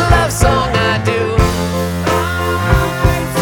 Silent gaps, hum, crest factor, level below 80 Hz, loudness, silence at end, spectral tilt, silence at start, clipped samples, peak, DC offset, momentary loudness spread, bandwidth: none; none; 14 dB; -22 dBFS; -14 LUFS; 0 s; -5 dB/octave; 0 s; under 0.1%; 0 dBFS; under 0.1%; 4 LU; 19 kHz